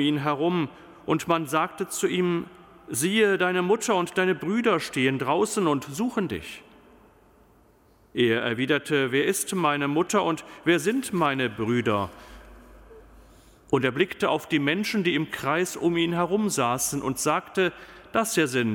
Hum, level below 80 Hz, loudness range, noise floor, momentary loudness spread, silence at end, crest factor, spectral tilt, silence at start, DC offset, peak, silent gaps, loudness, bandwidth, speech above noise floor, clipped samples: none; -58 dBFS; 4 LU; -58 dBFS; 5 LU; 0 s; 16 dB; -4.5 dB/octave; 0 s; under 0.1%; -8 dBFS; none; -25 LUFS; 17 kHz; 34 dB; under 0.1%